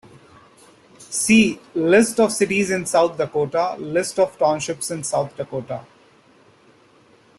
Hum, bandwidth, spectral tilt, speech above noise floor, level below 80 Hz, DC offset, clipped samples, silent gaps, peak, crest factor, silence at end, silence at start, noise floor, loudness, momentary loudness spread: none; 12.5 kHz; -4 dB/octave; 34 dB; -58 dBFS; under 0.1%; under 0.1%; none; -4 dBFS; 18 dB; 1.55 s; 1 s; -53 dBFS; -20 LUFS; 12 LU